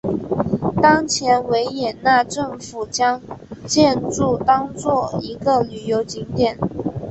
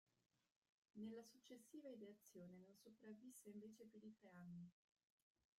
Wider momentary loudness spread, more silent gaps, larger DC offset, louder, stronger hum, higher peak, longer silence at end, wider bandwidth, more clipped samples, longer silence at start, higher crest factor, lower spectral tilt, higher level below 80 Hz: about the same, 10 LU vs 9 LU; neither; neither; first, -19 LUFS vs -62 LUFS; neither; first, -2 dBFS vs -46 dBFS; second, 0 s vs 0.9 s; second, 8.4 kHz vs 15.5 kHz; neither; second, 0.05 s vs 0.95 s; about the same, 18 dB vs 16 dB; second, -4.5 dB/octave vs -6 dB/octave; first, -46 dBFS vs under -90 dBFS